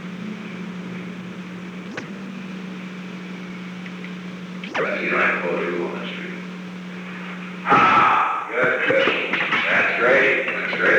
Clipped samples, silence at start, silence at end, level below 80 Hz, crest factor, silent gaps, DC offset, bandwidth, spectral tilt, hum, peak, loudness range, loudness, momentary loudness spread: under 0.1%; 0 s; 0 s; -68 dBFS; 18 dB; none; under 0.1%; 10.5 kHz; -5.5 dB/octave; none; -4 dBFS; 15 LU; -19 LUFS; 18 LU